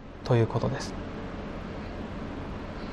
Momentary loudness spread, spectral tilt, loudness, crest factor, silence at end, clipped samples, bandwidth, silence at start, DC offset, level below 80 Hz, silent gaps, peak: 12 LU; -7 dB/octave; -32 LUFS; 18 dB; 0 s; under 0.1%; 10 kHz; 0 s; under 0.1%; -44 dBFS; none; -12 dBFS